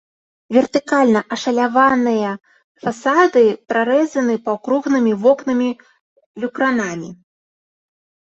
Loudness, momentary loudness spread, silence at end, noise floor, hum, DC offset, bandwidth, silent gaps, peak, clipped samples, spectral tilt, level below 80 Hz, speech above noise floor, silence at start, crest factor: -17 LUFS; 13 LU; 1.15 s; under -90 dBFS; none; under 0.1%; 8 kHz; 2.64-2.75 s, 6.01-6.16 s, 6.26-6.34 s; -2 dBFS; under 0.1%; -5 dB/octave; -64 dBFS; over 74 dB; 0.5 s; 16 dB